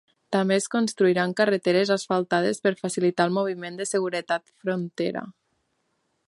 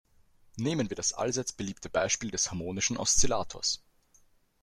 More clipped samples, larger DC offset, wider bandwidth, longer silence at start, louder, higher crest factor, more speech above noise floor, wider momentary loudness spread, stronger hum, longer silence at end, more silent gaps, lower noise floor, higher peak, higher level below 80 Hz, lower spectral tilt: neither; neither; second, 11.5 kHz vs 13.5 kHz; second, 0.3 s vs 0.55 s; first, -24 LUFS vs -30 LUFS; about the same, 18 dB vs 22 dB; first, 49 dB vs 34 dB; about the same, 8 LU vs 10 LU; neither; first, 1 s vs 0.85 s; neither; first, -73 dBFS vs -64 dBFS; first, -6 dBFS vs -10 dBFS; second, -74 dBFS vs -48 dBFS; first, -5 dB/octave vs -2.5 dB/octave